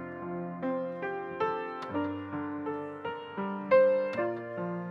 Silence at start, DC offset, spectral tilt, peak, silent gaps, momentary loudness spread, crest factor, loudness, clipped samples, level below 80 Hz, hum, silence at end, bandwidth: 0 s; under 0.1%; -8.5 dB/octave; -12 dBFS; none; 13 LU; 20 dB; -32 LUFS; under 0.1%; -74 dBFS; none; 0 s; 5.8 kHz